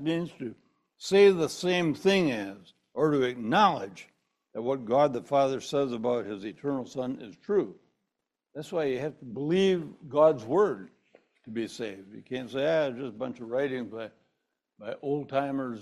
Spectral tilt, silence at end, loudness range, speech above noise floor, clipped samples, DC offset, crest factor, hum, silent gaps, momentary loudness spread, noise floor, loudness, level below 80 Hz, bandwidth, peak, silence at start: -5.5 dB/octave; 0 s; 7 LU; 57 dB; under 0.1%; under 0.1%; 20 dB; none; none; 17 LU; -85 dBFS; -28 LUFS; -70 dBFS; 12.5 kHz; -8 dBFS; 0 s